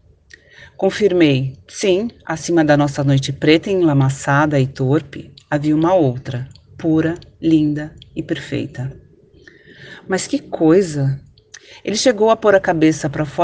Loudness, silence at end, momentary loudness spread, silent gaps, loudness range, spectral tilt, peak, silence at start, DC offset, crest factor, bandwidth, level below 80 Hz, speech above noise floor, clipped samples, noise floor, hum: -17 LUFS; 0 s; 14 LU; none; 5 LU; -6 dB/octave; 0 dBFS; 0.6 s; under 0.1%; 18 dB; 9.6 kHz; -50 dBFS; 31 dB; under 0.1%; -47 dBFS; none